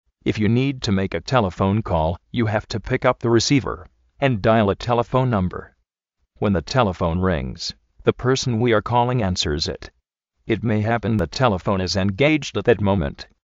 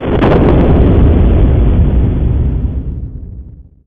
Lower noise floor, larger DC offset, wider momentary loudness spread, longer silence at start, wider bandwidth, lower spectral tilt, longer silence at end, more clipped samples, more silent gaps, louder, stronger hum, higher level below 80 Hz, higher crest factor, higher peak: first, -74 dBFS vs -31 dBFS; neither; second, 8 LU vs 16 LU; first, 0.25 s vs 0 s; first, 7.8 kHz vs 4.2 kHz; second, -5.5 dB/octave vs -11 dB/octave; about the same, 0.2 s vs 0.25 s; neither; neither; second, -21 LUFS vs -11 LUFS; neither; second, -40 dBFS vs -12 dBFS; first, 18 dB vs 10 dB; about the same, -2 dBFS vs 0 dBFS